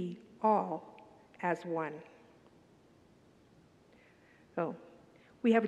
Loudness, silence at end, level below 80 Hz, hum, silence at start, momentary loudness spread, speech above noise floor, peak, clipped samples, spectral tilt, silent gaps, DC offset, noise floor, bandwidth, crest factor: -35 LUFS; 0 s; -80 dBFS; none; 0 s; 25 LU; 29 dB; -14 dBFS; under 0.1%; -7.5 dB/octave; none; under 0.1%; -63 dBFS; 8.6 kHz; 22 dB